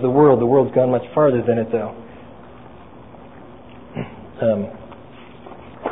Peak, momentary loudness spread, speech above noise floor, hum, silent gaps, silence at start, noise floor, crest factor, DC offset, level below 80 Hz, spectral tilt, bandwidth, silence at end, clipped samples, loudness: -2 dBFS; 26 LU; 25 dB; none; none; 0 s; -41 dBFS; 18 dB; 0.5%; -52 dBFS; -13 dB/octave; 3.9 kHz; 0 s; under 0.1%; -18 LUFS